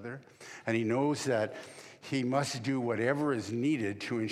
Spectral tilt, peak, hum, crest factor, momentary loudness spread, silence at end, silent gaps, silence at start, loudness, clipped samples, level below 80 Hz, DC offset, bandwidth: -5.5 dB/octave; -14 dBFS; none; 18 dB; 16 LU; 0 s; none; 0 s; -32 LUFS; under 0.1%; -80 dBFS; under 0.1%; 14 kHz